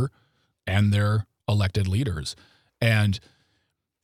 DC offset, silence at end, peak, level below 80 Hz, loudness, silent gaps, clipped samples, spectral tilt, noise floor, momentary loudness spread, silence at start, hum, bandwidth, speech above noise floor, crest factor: under 0.1%; 0.85 s; -6 dBFS; -52 dBFS; -25 LUFS; none; under 0.1%; -6 dB/octave; -74 dBFS; 12 LU; 0 s; none; 14.5 kHz; 52 dB; 18 dB